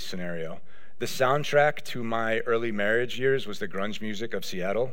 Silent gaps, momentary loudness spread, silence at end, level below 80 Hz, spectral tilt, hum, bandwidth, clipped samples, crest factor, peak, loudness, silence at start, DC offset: none; 11 LU; 0 s; -66 dBFS; -4.5 dB/octave; none; 16.5 kHz; under 0.1%; 18 dB; -8 dBFS; -28 LUFS; 0 s; 3%